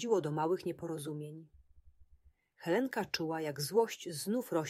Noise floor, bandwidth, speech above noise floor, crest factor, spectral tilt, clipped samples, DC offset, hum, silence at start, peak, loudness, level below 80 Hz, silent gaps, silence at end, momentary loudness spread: -66 dBFS; 16 kHz; 31 dB; 20 dB; -5 dB/octave; under 0.1%; under 0.1%; none; 0 s; -16 dBFS; -36 LUFS; -70 dBFS; none; 0 s; 12 LU